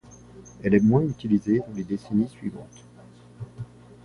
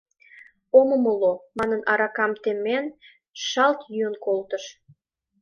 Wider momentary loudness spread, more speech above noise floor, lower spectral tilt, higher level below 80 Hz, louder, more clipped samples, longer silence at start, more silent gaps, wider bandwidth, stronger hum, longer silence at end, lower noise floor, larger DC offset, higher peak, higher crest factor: first, 22 LU vs 14 LU; about the same, 26 dB vs 29 dB; first, -8.5 dB/octave vs -3.5 dB/octave; first, -54 dBFS vs -66 dBFS; about the same, -24 LUFS vs -23 LUFS; neither; second, 0.35 s vs 0.75 s; second, none vs 3.30-3.34 s; first, 10.5 kHz vs 7 kHz; first, 60 Hz at -45 dBFS vs none; second, 0.4 s vs 0.7 s; about the same, -49 dBFS vs -51 dBFS; neither; about the same, -6 dBFS vs -4 dBFS; about the same, 20 dB vs 20 dB